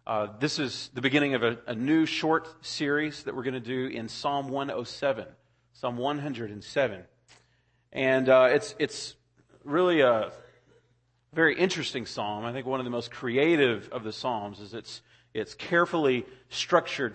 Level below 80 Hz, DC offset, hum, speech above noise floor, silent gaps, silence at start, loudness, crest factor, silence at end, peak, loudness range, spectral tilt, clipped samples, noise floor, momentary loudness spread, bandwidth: -68 dBFS; under 0.1%; none; 42 dB; none; 0.05 s; -28 LUFS; 22 dB; 0 s; -6 dBFS; 6 LU; -5 dB/octave; under 0.1%; -69 dBFS; 14 LU; 8.8 kHz